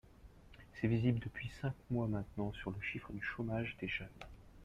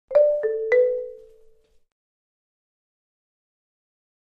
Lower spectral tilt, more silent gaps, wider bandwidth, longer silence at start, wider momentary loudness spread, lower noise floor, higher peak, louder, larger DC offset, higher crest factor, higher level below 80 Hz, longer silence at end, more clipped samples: first, -8 dB/octave vs -4.5 dB/octave; neither; first, 8 kHz vs 5 kHz; about the same, 0.05 s vs 0.1 s; first, 18 LU vs 12 LU; first, -59 dBFS vs -55 dBFS; second, -22 dBFS vs -8 dBFS; second, -40 LUFS vs -21 LUFS; neither; about the same, 18 dB vs 18 dB; first, -58 dBFS vs -64 dBFS; second, 0 s vs 3.2 s; neither